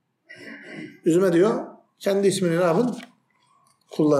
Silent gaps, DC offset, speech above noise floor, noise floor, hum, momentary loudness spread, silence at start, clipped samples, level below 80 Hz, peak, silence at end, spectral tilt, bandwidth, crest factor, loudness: none; under 0.1%; 43 dB; -63 dBFS; none; 21 LU; 0.3 s; under 0.1%; -76 dBFS; -8 dBFS; 0 s; -6 dB/octave; 14.5 kHz; 14 dB; -22 LUFS